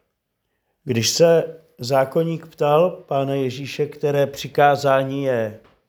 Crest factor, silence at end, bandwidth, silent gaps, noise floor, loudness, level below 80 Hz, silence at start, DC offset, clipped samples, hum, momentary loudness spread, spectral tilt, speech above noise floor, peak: 18 dB; 0.3 s; over 20 kHz; none; -74 dBFS; -20 LUFS; -64 dBFS; 0.85 s; under 0.1%; under 0.1%; none; 10 LU; -5 dB/octave; 55 dB; -4 dBFS